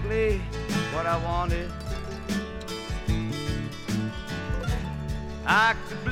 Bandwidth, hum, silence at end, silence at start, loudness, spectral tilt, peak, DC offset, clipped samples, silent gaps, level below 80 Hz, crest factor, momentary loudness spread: 16.5 kHz; none; 0 s; 0 s; -28 LUFS; -5.5 dB/octave; -8 dBFS; under 0.1%; under 0.1%; none; -36 dBFS; 20 dB; 11 LU